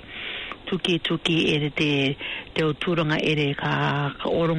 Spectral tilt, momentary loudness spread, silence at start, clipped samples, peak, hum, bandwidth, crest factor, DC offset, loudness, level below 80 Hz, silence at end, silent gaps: -6 dB/octave; 9 LU; 0 s; under 0.1%; -10 dBFS; none; 10.5 kHz; 14 dB; under 0.1%; -24 LUFS; -52 dBFS; 0 s; none